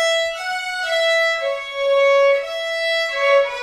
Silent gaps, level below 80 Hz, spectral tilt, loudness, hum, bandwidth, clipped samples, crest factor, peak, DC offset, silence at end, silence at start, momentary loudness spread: none; -58 dBFS; 1.5 dB/octave; -18 LUFS; none; 14 kHz; under 0.1%; 12 dB; -6 dBFS; under 0.1%; 0 s; 0 s; 8 LU